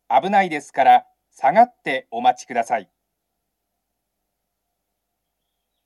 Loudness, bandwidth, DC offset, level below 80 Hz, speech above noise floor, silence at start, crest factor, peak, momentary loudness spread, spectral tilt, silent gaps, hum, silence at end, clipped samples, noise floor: -19 LUFS; 12 kHz; under 0.1%; -82 dBFS; 59 dB; 0.1 s; 18 dB; -2 dBFS; 10 LU; -4.5 dB/octave; none; none; 3.05 s; under 0.1%; -78 dBFS